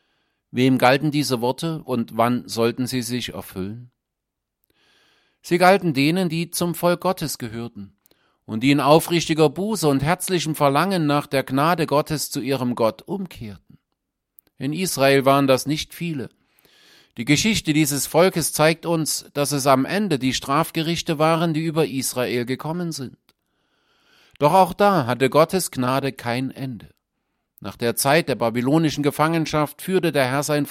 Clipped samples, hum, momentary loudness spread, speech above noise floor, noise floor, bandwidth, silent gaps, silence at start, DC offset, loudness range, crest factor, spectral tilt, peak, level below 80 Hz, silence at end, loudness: under 0.1%; none; 14 LU; 61 dB; -81 dBFS; 16.5 kHz; none; 0.55 s; under 0.1%; 5 LU; 20 dB; -5 dB/octave; -2 dBFS; -54 dBFS; 0 s; -20 LUFS